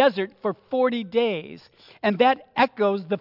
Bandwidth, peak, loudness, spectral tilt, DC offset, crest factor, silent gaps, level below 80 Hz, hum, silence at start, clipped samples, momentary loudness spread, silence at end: 5.8 kHz; -6 dBFS; -23 LUFS; -7.5 dB/octave; under 0.1%; 16 dB; none; -70 dBFS; none; 0 s; under 0.1%; 9 LU; 0 s